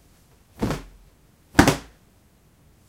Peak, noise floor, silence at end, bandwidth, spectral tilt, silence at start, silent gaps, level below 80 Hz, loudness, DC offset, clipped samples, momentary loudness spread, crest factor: 0 dBFS; -57 dBFS; 1.05 s; 16.5 kHz; -5 dB/octave; 0.6 s; none; -40 dBFS; -23 LUFS; under 0.1%; under 0.1%; 13 LU; 26 dB